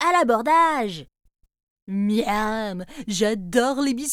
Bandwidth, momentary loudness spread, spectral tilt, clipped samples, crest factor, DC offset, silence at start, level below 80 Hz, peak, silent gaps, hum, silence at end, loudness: 16.5 kHz; 13 LU; -4 dB/octave; under 0.1%; 16 dB; under 0.1%; 0 s; -50 dBFS; -6 dBFS; 1.63-1.76 s, 1.82-1.87 s; none; 0 s; -22 LUFS